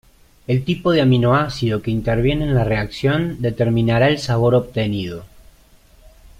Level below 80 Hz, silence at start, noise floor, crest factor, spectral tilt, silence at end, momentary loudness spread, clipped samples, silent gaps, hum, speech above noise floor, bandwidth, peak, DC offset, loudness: -38 dBFS; 0.5 s; -50 dBFS; 16 dB; -7.5 dB/octave; 0.1 s; 7 LU; under 0.1%; none; none; 32 dB; 12 kHz; -2 dBFS; under 0.1%; -18 LUFS